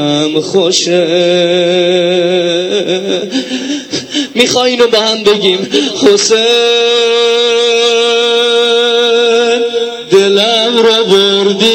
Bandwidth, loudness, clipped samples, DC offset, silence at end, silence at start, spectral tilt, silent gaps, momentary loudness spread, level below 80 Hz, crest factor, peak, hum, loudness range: 15.5 kHz; -9 LUFS; 0.3%; under 0.1%; 0 s; 0 s; -3 dB/octave; none; 7 LU; -58 dBFS; 10 dB; 0 dBFS; none; 3 LU